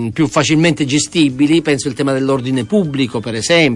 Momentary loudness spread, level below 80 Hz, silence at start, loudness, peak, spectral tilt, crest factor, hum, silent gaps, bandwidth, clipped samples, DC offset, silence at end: 5 LU; -50 dBFS; 0 s; -14 LUFS; -2 dBFS; -4.5 dB/octave; 12 dB; none; none; 11.5 kHz; under 0.1%; under 0.1%; 0 s